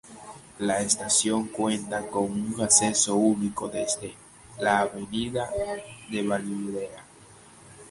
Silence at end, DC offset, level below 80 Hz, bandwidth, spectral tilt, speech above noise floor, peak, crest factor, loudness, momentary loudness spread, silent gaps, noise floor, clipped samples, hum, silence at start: 0 s; under 0.1%; -58 dBFS; 11.5 kHz; -3 dB/octave; 25 dB; -4 dBFS; 22 dB; -25 LUFS; 14 LU; none; -51 dBFS; under 0.1%; none; 0.05 s